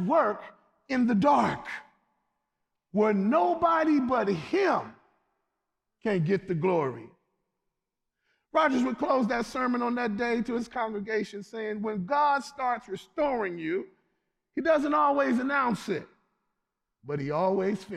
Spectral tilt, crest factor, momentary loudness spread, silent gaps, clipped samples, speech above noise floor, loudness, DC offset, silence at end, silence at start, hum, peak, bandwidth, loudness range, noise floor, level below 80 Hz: -7 dB/octave; 16 dB; 11 LU; none; under 0.1%; 58 dB; -27 LUFS; under 0.1%; 0 s; 0 s; none; -12 dBFS; 12 kHz; 3 LU; -85 dBFS; -64 dBFS